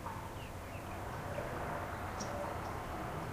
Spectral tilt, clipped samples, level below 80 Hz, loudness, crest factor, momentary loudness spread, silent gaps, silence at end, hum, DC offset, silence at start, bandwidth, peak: -5.5 dB/octave; under 0.1%; -52 dBFS; -42 LUFS; 14 dB; 5 LU; none; 0 s; none; under 0.1%; 0 s; 15.5 kHz; -28 dBFS